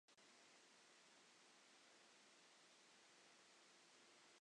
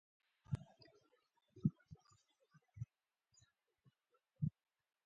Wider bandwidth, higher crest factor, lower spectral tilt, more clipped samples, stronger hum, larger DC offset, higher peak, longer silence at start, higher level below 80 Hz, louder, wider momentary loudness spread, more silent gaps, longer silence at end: first, 10 kHz vs 7.6 kHz; second, 14 dB vs 28 dB; second, -0.5 dB/octave vs -10 dB/octave; neither; neither; neither; second, -58 dBFS vs -24 dBFS; second, 0.1 s vs 0.5 s; second, under -90 dBFS vs -70 dBFS; second, -69 LUFS vs -47 LUFS; second, 0 LU vs 21 LU; neither; second, 0 s vs 0.55 s